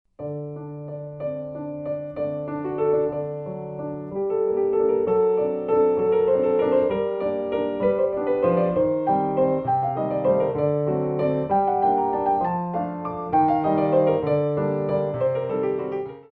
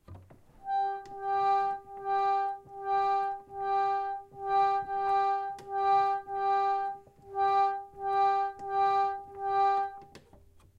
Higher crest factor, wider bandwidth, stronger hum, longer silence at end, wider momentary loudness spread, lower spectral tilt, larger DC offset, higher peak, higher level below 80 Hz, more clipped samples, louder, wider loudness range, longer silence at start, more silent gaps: about the same, 14 dB vs 14 dB; second, 4.5 kHz vs 7.2 kHz; neither; second, 0.1 s vs 0.6 s; about the same, 11 LU vs 10 LU; first, -11 dB/octave vs -5 dB/octave; neither; first, -8 dBFS vs -18 dBFS; first, -56 dBFS vs -66 dBFS; neither; first, -23 LUFS vs -30 LUFS; first, 6 LU vs 2 LU; about the same, 0.2 s vs 0.1 s; neither